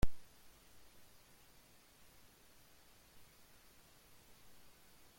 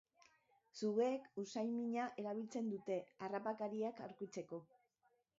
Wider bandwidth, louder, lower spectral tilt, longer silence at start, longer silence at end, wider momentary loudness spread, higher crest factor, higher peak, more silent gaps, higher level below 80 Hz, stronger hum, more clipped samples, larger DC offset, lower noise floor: first, 16.5 kHz vs 7.6 kHz; second, -61 LUFS vs -44 LUFS; about the same, -5 dB/octave vs -5.5 dB/octave; second, 0.05 s vs 0.75 s; second, 0.45 s vs 0.75 s; second, 1 LU vs 11 LU; first, 24 dB vs 18 dB; first, -18 dBFS vs -26 dBFS; neither; first, -54 dBFS vs under -90 dBFS; neither; neither; neither; second, -65 dBFS vs -81 dBFS